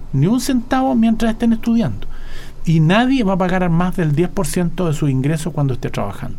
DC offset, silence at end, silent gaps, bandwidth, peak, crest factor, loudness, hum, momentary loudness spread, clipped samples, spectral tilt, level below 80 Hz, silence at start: under 0.1%; 0 s; none; 16 kHz; -2 dBFS; 14 dB; -17 LUFS; none; 10 LU; under 0.1%; -6.5 dB/octave; -28 dBFS; 0 s